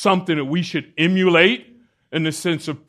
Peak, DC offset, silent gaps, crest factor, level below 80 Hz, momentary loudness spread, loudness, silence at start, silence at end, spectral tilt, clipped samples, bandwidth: 0 dBFS; under 0.1%; none; 20 dB; -66 dBFS; 11 LU; -19 LUFS; 0 s; 0.1 s; -5 dB/octave; under 0.1%; 13.5 kHz